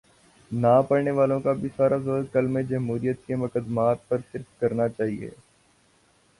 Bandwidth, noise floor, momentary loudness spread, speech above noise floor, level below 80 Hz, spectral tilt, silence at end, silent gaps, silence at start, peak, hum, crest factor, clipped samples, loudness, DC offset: 11.5 kHz; -62 dBFS; 9 LU; 38 dB; -60 dBFS; -9 dB/octave; 1.1 s; none; 0.5 s; -8 dBFS; none; 18 dB; under 0.1%; -25 LUFS; under 0.1%